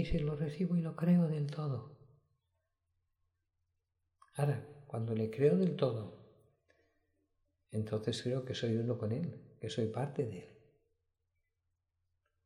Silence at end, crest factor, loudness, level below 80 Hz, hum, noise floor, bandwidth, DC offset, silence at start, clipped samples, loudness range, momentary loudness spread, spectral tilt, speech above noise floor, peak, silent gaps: 1.95 s; 20 dB; -36 LUFS; -58 dBFS; none; -85 dBFS; 11.5 kHz; under 0.1%; 0 s; under 0.1%; 7 LU; 13 LU; -7.5 dB/octave; 50 dB; -18 dBFS; none